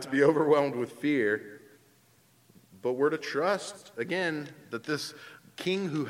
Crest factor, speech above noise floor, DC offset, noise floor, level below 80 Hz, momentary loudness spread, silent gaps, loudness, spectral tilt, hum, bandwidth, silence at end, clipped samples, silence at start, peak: 20 dB; 34 dB; under 0.1%; -63 dBFS; -80 dBFS; 15 LU; none; -29 LUFS; -5.5 dB/octave; none; 16 kHz; 0 s; under 0.1%; 0 s; -10 dBFS